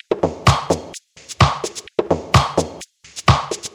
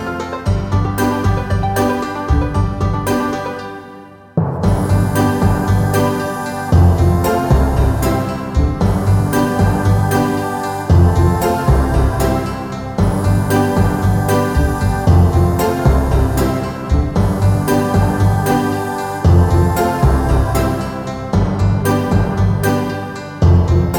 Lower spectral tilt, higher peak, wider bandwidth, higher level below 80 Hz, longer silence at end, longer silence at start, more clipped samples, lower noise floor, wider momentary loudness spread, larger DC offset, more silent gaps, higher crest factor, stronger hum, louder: second, -5 dB/octave vs -7 dB/octave; about the same, 0 dBFS vs 0 dBFS; second, 15 kHz vs 18.5 kHz; second, -32 dBFS vs -22 dBFS; about the same, 0.05 s vs 0 s; about the same, 0.1 s vs 0 s; neither; about the same, -38 dBFS vs -36 dBFS; first, 19 LU vs 8 LU; neither; neither; first, 20 dB vs 14 dB; neither; second, -18 LUFS vs -15 LUFS